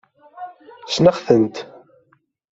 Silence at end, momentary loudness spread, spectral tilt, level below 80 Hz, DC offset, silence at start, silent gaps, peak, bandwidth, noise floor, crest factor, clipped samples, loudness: 0.85 s; 23 LU; -6 dB/octave; -56 dBFS; under 0.1%; 0.35 s; none; -2 dBFS; 7.8 kHz; -61 dBFS; 20 dB; under 0.1%; -17 LUFS